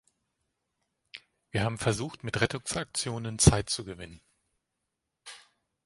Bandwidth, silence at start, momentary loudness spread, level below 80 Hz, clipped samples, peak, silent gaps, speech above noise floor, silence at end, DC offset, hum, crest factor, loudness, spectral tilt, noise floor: 11.5 kHz; 1.15 s; 25 LU; -44 dBFS; under 0.1%; -4 dBFS; none; 55 dB; 0.5 s; under 0.1%; none; 28 dB; -29 LUFS; -4 dB/octave; -84 dBFS